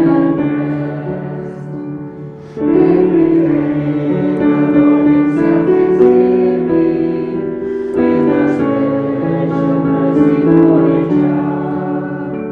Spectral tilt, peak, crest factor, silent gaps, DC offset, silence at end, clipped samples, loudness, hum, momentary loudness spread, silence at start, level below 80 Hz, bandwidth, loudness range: -10.5 dB/octave; 0 dBFS; 12 dB; none; under 0.1%; 0 s; under 0.1%; -13 LUFS; none; 12 LU; 0 s; -46 dBFS; 4.6 kHz; 3 LU